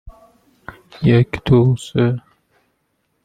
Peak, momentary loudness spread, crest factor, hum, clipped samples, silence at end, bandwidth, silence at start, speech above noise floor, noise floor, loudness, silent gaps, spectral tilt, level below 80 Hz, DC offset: -2 dBFS; 18 LU; 18 dB; none; under 0.1%; 1.05 s; 9.2 kHz; 0.05 s; 53 dB; -68 dBFS; -16 LUFS; none; -8 dB/octave; -42 dBFS; under 0.1%